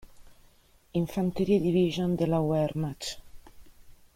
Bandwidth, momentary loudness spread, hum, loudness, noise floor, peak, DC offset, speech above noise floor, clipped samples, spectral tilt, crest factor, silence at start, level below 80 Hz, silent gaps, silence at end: 16 kHz; 11 LU; none; -28 LUFS; -60 dBFS; -12 dBFS; under 0.1%; 33 dB; under 0.1%; -7 dB/octave; 16 dB; 0.1 s; -54 dBFS; none; 0.25 s